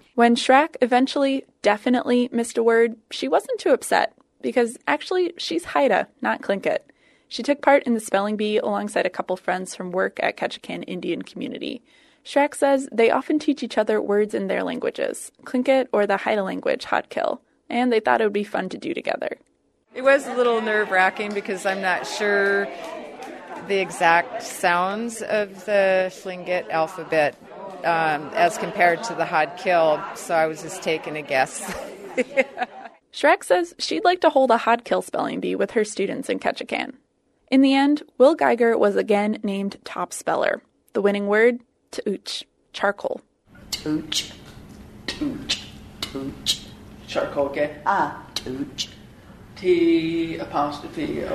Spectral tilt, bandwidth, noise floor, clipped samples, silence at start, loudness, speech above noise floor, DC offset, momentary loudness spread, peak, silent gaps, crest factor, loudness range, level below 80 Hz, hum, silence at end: -4 dB/octave; 13.5 kHz; -45 dBFS; under 0.1%; 0.15 s; -22 LUFS; 23 dB; under 0.1%; 13 LU; -2 dBFS; none; 22 dB; 6 LU; -58 dBFS; none; 0 s